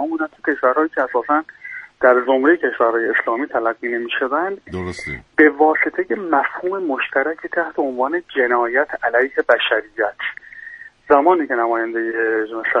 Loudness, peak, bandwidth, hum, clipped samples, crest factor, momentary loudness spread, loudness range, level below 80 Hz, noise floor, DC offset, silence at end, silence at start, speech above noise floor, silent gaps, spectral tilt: -18 LUFS; 0 dBFS; 10 kHz; none; under 0.1%; 18 dB; 12 LU; 2 LU; -56 dBFS; -38 dBFS; under 0.1%; 0 s; 0 s; 20 dB; none; -5.5 dB/octave